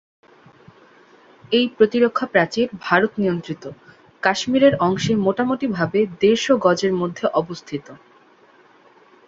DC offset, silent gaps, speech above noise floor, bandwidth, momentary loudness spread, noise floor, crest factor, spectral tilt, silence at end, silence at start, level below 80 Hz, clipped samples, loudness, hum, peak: under 0.1%; none; 33 dB; 7.8 kHz; 12 LU; -52 dBFS; 20 dB; -5.5 dB/octave; 1.3 s; 1.5 s; -58 dBFS; under 0.1%; -19 LUFS; none; -2 dBFS